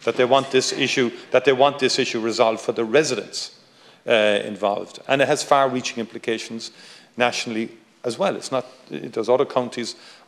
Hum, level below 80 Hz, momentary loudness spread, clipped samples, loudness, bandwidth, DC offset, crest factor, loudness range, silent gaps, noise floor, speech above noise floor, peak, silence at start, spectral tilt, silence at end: none; -76 dBFS; 14 LU; under 0.1%; -21 LUFS; 13.5 kHz; under 0.1%; 20 dB; 5 LU; none; -51 dBFS; 30 dB; -2 dBFS; 0 s; -3.5 dB/octave; 0.15 s